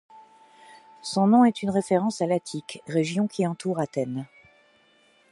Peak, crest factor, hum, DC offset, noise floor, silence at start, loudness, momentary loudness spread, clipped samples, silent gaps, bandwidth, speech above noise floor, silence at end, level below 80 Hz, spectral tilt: -8 dBFS; 18 dB; none; under 0.1%; -61 dBFS; 0.15 s; -25 LUFS; 16 LU; under 0.1%; none; 11.5 kHz; 37 dB; 1.05 s; -70 dBFS; -6 dB/octave